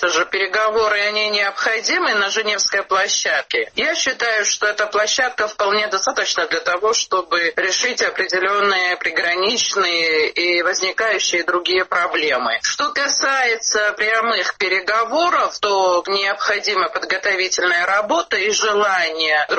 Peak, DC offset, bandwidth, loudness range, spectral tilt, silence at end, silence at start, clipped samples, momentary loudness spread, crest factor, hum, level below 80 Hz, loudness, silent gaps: -4 dBFS; under 0.1%; 8.4 kHz; 1 LU; 0 dB/octave; 0 s; 0 s; under 0.1%; 2 LU; 14 dB; none; -60 dBFS; -17 LUFS; none